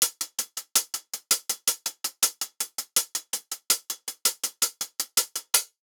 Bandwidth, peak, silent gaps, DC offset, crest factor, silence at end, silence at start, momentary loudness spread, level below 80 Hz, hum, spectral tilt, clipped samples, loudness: over 20 kHz; -4 dBFS; none; under 0.1%; 26 dB; 0.2 s; 0 s; 7 LU; -88 dBFS; none; 3 dB/octave; under 0.1%; -26 LUFS